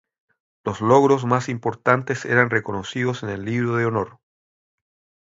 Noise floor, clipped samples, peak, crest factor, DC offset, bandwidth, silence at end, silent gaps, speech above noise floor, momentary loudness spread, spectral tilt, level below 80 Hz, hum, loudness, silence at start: under -90 dBFS; under 0.1%; 0 dBFS; 22 dB; under 0.1%; 7.8 kHz; 1.15 s; none; over 70 dB; 12 LU; -6.5 dB/octave; -56 dBFS; none; -21 LUFS; 0.65 s